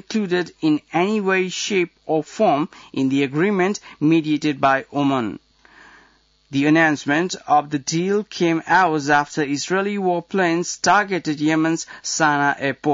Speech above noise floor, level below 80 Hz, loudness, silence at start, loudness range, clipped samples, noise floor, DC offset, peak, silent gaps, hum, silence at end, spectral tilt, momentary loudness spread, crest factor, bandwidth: 37 dB; -64 dBFS; -20 LUFS; 0.1 s; 2 LU; under 0.1%; -57 dBFS; under 0.1%; -4 dBFS; none; none; 0 s; -4.5 dB/octave; 6 LU; 16 dB; 7.8 kHz